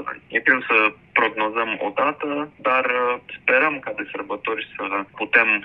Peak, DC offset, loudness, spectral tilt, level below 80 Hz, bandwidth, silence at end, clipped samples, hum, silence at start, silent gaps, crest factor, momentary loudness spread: -2 dBFS; under 0.1%; -21 LUFS; -6.5 dB/octave; -66 dBFS; 5.6 kHz; 0 s; under 0.1%; none; 0 s; none; 20 dB; 10 LU